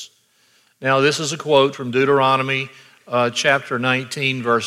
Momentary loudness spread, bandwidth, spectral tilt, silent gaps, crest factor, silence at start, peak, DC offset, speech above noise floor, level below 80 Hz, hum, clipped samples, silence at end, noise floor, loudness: 8 LU; 15 kHz; -4 dB/octave; none; 16 dB; 0 s; -2 dBFS; under 0.1%; 40 dB; -68 dBFS; none; under 0.1%; 0 s; -58 dBFS; -18 LUFS